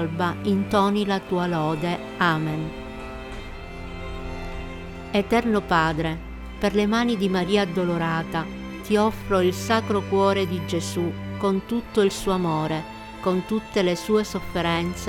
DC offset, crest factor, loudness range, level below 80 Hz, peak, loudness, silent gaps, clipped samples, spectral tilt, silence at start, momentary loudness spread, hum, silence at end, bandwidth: under 0.1%; 16 dB; 5 LU; -42 dBFS; -8 dBFS; -24 LUFS; none; under 0.1%; -6 dB/octave; 0 s; 14 LU; none; 0 s; 16.5 kHz